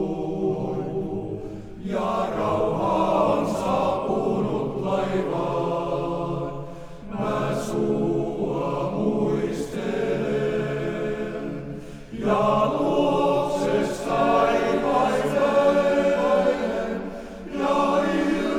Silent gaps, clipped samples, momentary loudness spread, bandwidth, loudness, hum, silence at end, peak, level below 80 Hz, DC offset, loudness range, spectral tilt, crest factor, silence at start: none; under 0.1%; 11 LU; 14.5 kHz; -24 LUFS; none; 0 s; -8 dBFS; -46 dBFS; under 0.1%; 5 LU; -6.5 dB/octave; 16 dB; 0 s